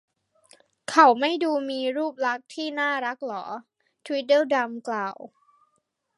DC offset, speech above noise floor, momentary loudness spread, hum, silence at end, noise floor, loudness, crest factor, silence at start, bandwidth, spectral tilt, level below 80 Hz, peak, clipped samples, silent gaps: under 0.1%; 49 dB; 16 LU; none; 0.9 s; -73 dBFS; -24 LUFS; 24 dB; 0.9 s; 11.5 kHz; -3 dB/octave; -82 dBFS; -2 dBFS; under 0.1%; none